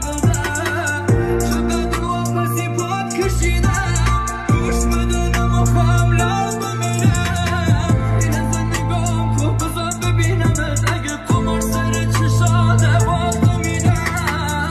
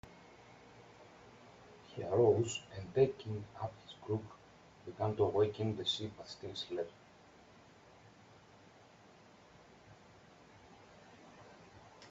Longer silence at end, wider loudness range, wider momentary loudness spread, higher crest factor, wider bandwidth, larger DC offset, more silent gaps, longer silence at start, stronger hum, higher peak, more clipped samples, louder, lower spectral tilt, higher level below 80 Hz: about the same, 0 s vs 0 s; second, 2 LU vs 14 LU; second, 5 LU vs 27 LU; second, 14 dB vs 22 dB; first, 14 kHz vs 8 kHz; neither; neither; about the same, 0 s vs 0.05 s; neither; first, -4 dBFS vs -18 dBFS; neither; first, -18 LUFS vs -37 LUFS; about the same, -5.5 dB/octave vs -5.5 dB/octave; first, -24 dBFS vs -72 dBFS